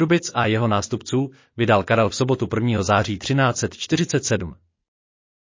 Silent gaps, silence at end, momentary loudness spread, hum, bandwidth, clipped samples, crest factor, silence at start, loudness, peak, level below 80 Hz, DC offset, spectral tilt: none; 0.9 s; 6 LU; none; 7.6 kHz; under 0.1%; 16 dB; 0 s; -21 LUFS; -4 dBFS; -46 dBFS; under 0.1%; -5 dB/octave